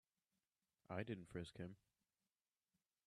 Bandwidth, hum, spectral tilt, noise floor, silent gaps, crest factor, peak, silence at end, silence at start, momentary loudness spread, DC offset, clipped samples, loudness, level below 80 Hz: 12 kHz; none; -6.5 dB/octave; under -90 dBFS; none; 24 dB; -32 dBFS; 1.3 s; 0.9 s; 7 LU; under 0.1%; under 0.1%; -52 LUFS; -80 dBFS